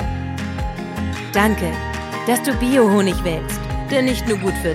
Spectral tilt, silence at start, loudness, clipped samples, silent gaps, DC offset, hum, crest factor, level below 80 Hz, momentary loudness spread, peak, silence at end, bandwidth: -5.5 dB/octave; 0 s; -20 LUFS; under 0.1%; none; under 0.1%; none; 18 dB; -30 dBFS; 10 LU; 0 dBFS; 0 s; 16.5 kHz